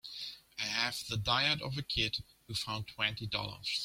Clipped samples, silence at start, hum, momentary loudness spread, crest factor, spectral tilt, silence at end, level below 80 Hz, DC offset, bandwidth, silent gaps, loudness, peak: under 0.1%; 0.05 s; none; 11 LU; 22 dB; -3 dB/octave; 0 s; -56 dBFS; under 0.1%; 16.5 kHz; none; -34 LUFS; -14 dBFS